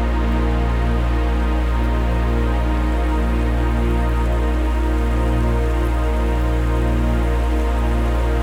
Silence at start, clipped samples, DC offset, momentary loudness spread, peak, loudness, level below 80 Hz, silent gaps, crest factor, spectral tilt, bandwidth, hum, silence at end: 0 s; under 0.1%; under 0.1%; 1 LU; -8 dBFS; -20 LUFS; -18 dBFS; none; 10 dB; -7.5 dB/octave; 9.8 kHz; 60 Hz at -55 dBFS; 0 s